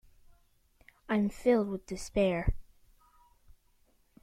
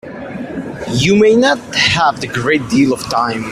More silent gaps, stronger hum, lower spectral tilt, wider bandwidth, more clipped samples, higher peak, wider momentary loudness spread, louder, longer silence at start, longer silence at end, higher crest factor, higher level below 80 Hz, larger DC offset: neither; neither; first, -6.5 dB/octave vs -4.5 dB/octave; about the same, 14 kHz vs 14.5 kHz; neither; second, -14 dBFS vs 0 dBFS; second, 10 LU vs 15 LU; second, -31 LUFS vs -13 LUFS; first, 1.1 s vs 0.05 s; first, 1.6 s vs 0 s; first, 20 dB vs 14 dB; about the same, -46 dBFS vs -44 dBFS; neither